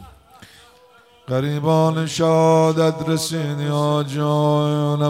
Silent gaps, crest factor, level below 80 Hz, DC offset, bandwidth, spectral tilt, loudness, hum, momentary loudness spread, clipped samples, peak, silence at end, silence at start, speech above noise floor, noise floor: none; 14 dB; -58 dBFS; under 0.1%; 15 kHz; -6.5 dB/octave; -19 LUFS; none; 7 LU; under 0.1%; -6 dBFS; 0 s; 0 s; 33 dB; -51 dBFS